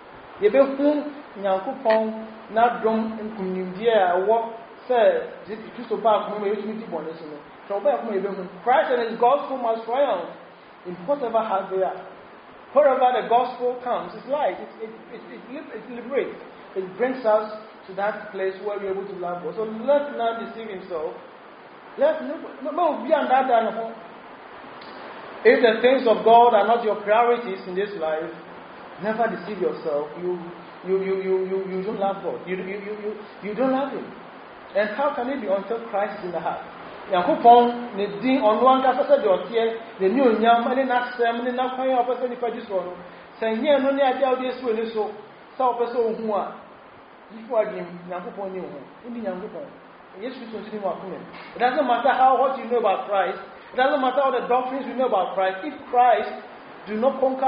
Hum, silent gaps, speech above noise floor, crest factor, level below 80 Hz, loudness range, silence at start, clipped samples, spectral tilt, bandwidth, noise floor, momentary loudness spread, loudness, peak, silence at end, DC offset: none; none; 24 dB; 20 dB; -68 dBFS; 8 LU; 0 s; under 0.1%; -3 dB/octave; 5.2 kHz; -46 dBFS; 19 LU; -23 LUFS; -2 dBFS; 0 s; under 0.1%